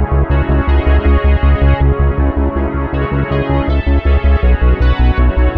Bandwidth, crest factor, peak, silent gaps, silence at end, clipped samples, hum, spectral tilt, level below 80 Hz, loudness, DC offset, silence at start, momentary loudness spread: 4.6 kHz; 10 dB; 0 dBFS; none; 0 s; under 0.1%; none; -10 dB/octave; -12 dBFS; -13 LUFS; under 0.1%; 0 s; 4 LU